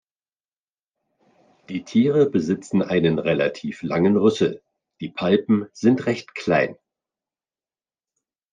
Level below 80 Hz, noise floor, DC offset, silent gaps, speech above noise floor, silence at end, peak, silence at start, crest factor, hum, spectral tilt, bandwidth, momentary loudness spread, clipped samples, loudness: -62 dBFS; under -90 dBFS; under 0.1%; none; over 70 dB; 1.8 s; -4 dBFS; 1.7 s; 18 dB; none; -7 dB/octave; 9.4 kHz; 12 LU; under 0.1%; -21 LUFS